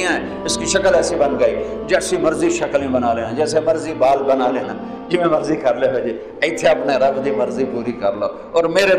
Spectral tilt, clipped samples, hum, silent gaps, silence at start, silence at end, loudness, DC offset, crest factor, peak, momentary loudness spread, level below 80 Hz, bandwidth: -4 dB/octave; under 0.1%; none; none; 0 s; 0 s; -18 LUFS; under 0.1%; 16 dB; 0 dBFS; 6 LU; -46 dBFS; 14 kHz